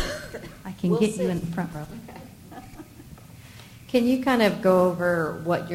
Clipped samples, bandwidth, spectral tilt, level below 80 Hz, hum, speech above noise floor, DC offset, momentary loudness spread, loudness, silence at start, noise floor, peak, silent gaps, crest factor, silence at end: under 0.1%; 16 kHz; -6 dB/octave; -50 dBFS; none; 23 dB; under 0.1%; 24 LU; -24 LUFS; 0 s; -45 dBFS; -6 dBFS; none; 18 dB; 0 s